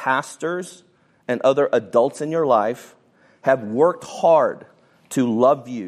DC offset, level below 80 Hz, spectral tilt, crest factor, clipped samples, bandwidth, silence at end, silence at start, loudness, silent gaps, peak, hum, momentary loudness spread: under 0.1%; -72 dBFS; -5.5 dB/octave; 18 dB; under 0.1%; 14 kHz; 0 s; 0 s; -20 LUFS; none; -2 dBFS; none; 11 LU